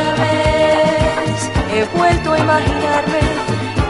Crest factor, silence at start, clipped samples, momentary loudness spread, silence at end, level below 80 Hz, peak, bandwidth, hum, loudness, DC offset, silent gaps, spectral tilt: 14 dB; 0 s; under 0.1%; 5 LU; 0 s; -28 dBFS; -2 dBFS; 11.5 kHz; none; -15 LUFS; under 0.1%; none; -5.5 dB/octave